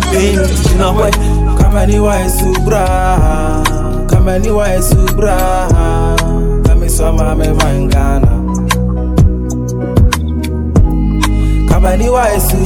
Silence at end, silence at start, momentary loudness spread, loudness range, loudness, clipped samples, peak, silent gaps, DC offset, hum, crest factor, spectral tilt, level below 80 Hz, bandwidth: 0 s; 0 s; 3 LU; 1 LU; -12 LUFS; under 0.1%; 0 dBFS; none; under 0.1%; none; 10 dB; -6 dB/octave; -12 dBFS; 16.5 kHz